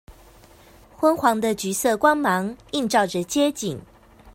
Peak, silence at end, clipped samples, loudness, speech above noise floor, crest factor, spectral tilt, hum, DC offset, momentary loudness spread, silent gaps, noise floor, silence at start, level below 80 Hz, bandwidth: -4 dBFS; 0.05 s; under 0.1%; -22 LUFS; 29 dB; 20 dB; -4 dB/octave; none; under 0.1%; 9 LU; none; -50 dBFS; 0.1 s; -54 dBFS; 16.5 kHz